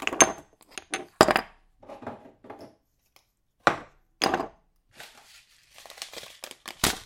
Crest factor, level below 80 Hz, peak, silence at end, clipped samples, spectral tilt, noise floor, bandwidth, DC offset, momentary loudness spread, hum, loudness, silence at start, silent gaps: 30 dB; -56 dBFS; 0 dBFS; 0.05 s; under 0.1%; -2 dB/octave; -67 dBFS; 16.5 kHz; under 0.1%; 26 LU; none; -25 LUFS; 0 s; none